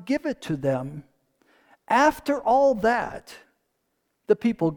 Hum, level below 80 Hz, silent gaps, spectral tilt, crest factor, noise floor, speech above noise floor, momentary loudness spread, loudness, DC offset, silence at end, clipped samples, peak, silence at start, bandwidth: none; -56 dBFS; none; -6 dB/octave; 20 dB; -75 dBFS; 52 dB; 15 LU; -23 LUFS; under 0.1%; 0 s; under 0.1%; -6 dBFS; 0 s; 19 kHz